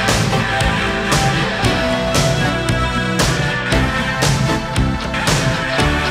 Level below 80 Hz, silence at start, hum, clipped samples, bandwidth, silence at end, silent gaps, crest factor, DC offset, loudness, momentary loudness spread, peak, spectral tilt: -26 dBFS; 0 s; none; under 0.1%; 16 kHz; 0 s; none; 14 dB; under 0.1%; -16 LUFS; 3 LU; -2 dBFS; -4.5 dB/octave